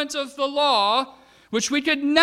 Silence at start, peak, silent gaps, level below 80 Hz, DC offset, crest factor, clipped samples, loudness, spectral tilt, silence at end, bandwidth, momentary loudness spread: 0 s; -2 dBFS; none; -64 dBFS; under 0.1%; 20 dB; under 0.1%; -22 LUFS; -2 dB/octave; 0 s; 14 kHz; 9 LU